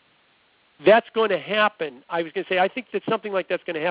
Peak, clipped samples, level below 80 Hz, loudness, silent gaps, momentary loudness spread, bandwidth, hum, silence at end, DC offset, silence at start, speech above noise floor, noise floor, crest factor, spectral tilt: -4 dBFS; under 0.1%; -68 dBFS; -23 LUFS; none; 11 LU; 4 kHz; none; 0 s; under 0.1%; 0.8 s; 39 dB; -61 dBFS; 20 dB; -8.5 dB/octave